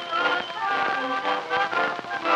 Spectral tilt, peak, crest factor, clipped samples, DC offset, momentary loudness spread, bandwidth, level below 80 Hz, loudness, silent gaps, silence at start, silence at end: -3 dB/octave; -8 dBFS; 16 dB; under 0.1%; under 0.1%; 3 LU; 11.5 kHz; -72 dBFS; -25 LUFS; none; 0 s; 0 s